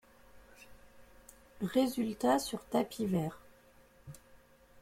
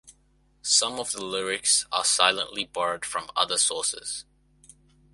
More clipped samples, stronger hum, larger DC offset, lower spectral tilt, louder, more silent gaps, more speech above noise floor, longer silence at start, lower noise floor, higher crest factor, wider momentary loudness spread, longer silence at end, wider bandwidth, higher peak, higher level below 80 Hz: neither; neither; neither; first, -5.5 dB/octave vs 0.5 dB/octave; second, -34 LUFS vs -24 LUFS; neither; second, 30 dB vs 37 dB; first, 0.35 s vs 0.05 s; about the same, -62 dBFS vs -64 dBFS; about the same, 22 dB vs 24 dB; first, 23 LU vs 11 LU; second, 0.45 s vs 0.9 s; first, 16.5 kHz vs 12 kHz; second, -16 dBFS vs -4 dBFS; about the same, -64 dBFS vs -64 dBFS